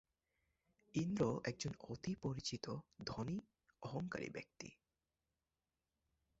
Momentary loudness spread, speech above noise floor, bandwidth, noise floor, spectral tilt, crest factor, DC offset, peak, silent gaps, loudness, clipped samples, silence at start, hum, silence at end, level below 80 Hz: 13 LU; over 46 dB; 8 kHz; under -90 dBFS; -5.5 dB/octave; 22 dB; under 0.1%; -24 dBFS; none; -45 LUFS; under 0.1%; 0.95 s; none; 1.65 s; -70 dBFS